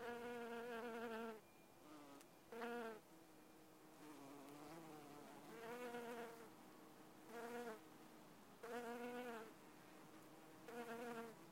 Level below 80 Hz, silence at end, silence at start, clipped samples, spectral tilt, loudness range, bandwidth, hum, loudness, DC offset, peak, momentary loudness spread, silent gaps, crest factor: -88 dBFS; 0 s; 0 s; under 0.1%; -4 dB/octave; 4 LU; 16 kHz; none; -55 LUFS; under 0.1%; -38 dBFS; 13 LU; none; 18 dB